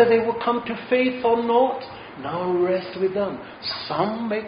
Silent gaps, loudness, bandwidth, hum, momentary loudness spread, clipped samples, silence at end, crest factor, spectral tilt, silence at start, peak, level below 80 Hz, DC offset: none; -23 LUFS; 5.2 kHz; none; 11 LU; under 0.1%; 0 s; 18 dB; -3.5 dB/octave; 0 s; -6 dBFS; -60 dBFS; under 0.1%